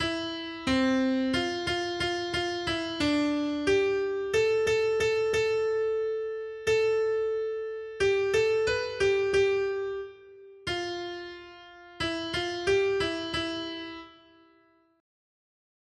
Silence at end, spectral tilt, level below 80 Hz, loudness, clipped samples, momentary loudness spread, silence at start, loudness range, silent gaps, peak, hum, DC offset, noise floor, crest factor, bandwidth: 1.9 s; -4 dB/octave; -56 dBFS; -28 LUFS; under 0.1%; 11 LU; 0 s; 5 LU; none; -14 dBFS; none; under 0.1%; -64 dBFS; 14 dB; 12 kHz